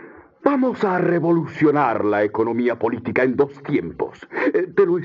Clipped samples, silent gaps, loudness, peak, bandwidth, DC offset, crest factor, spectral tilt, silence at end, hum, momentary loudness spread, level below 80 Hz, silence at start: under 0.1%; none; -20 LUFS; -2 dBFS; 7.2 kHz; under 0.1%; 18 dB; -9 dB/octave; 0 s; none; 6 LU; -60 dBFS; 0 s